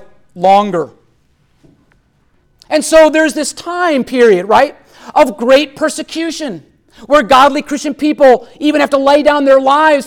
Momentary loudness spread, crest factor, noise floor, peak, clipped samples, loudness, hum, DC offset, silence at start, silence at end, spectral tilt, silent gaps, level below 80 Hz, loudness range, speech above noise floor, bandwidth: 11 LU; 12 dB; -54 dBFS; 0 dBFS; under 0.1%; -11 LUFS; none; under 0.1%; 0.35 s; 0 s; -3.5 dB/octave; none; -46 dBFS; 4 LU; 44 dB; 17 kHz